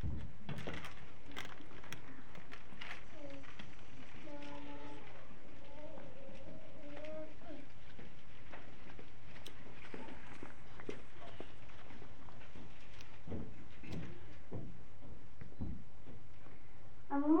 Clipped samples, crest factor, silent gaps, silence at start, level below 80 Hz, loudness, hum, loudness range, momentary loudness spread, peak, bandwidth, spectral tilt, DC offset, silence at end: under 0.1%; 26 dB; none; 0 s; -60 dBFS; -51 LUFS; none; 4 LU; 10 LU; -20 dBFS; 9.4 kHz; -6.5 dB/octave; 2%; 0 s